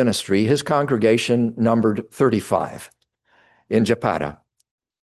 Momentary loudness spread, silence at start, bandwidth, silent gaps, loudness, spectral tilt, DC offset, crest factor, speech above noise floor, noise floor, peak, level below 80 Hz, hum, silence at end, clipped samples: 7 LU; 0 s; 12.5 kHz; none; -20 LUFS; -6 dB/octave; under 0.1%; 16 dB; 41 dB; -61 dBFS; -4 dBFS; -54 dBFS; none; 0.85 s; under 0.1%